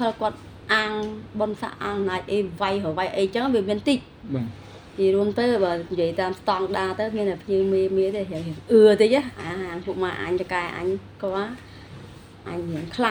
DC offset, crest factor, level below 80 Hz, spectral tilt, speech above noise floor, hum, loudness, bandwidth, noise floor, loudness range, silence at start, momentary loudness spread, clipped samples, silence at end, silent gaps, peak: under 0.1%; 18 dB; -54 dBFS; -6 dB/octave; 19 dB; none; -24 LUFS; 20 kHz; -43 dBFS; 6 LU; 0 s; 12 LU; under 0.1%; 0 s; none; -4 dBFS